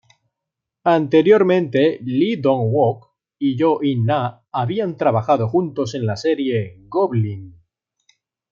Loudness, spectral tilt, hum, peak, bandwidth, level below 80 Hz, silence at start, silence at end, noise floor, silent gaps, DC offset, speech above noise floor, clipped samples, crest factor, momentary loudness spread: -19 LUFS; -8 dB/octave; none; -2 dBFS; 7.4 kHz; -62 dBFS; 0.85 s; 1 s; -83 dBFS; none; under 0.1%; 65 dB; under 0.1%; 18 dB; 10 LU